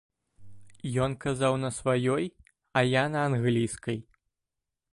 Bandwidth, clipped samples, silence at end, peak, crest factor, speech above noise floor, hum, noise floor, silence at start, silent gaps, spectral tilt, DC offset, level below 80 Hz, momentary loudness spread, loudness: 11.5 kHz; under 0.1%; 0.9 s; -8 dBFS; 20 dB; 60 dB; none; -87 dBFS; 0.4 s; none; -6 dB/octave; under 0.1%; -58 dBFS; 10 LU; -28 LUFS